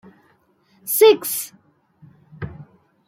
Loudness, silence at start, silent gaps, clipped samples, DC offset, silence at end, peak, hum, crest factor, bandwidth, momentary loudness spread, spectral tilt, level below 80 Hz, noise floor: -17 LUFS; 0.85 s; none; under 0.1%; under 0.1%; 0.45 s; -2 dBFS; none; 20 dB; 16.5 kHz; 22 LU; -3 dB/octave; -58 dBFS; -60 dBFS